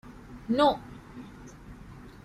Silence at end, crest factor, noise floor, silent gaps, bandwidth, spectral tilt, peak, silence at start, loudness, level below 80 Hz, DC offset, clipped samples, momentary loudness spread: 0.15 s; 22 dB; -47 dBFS; none; 13 kHz; -6 dB/octave; -10 dBFS; 0.05 s; -26 LUFS; -52 dBFS; under 0.1%; under 0.1%; 24 LU